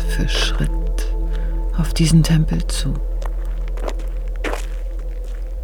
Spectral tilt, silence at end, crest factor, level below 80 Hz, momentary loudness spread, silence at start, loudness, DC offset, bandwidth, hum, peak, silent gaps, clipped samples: -5.5 dB/octave; 0 s; 16 dB; -20 dBFS; 14 LU; 0 s; -22 LUFS; under 0.1%; 14 kHz; none; -2 dBFS; none; under 0.1%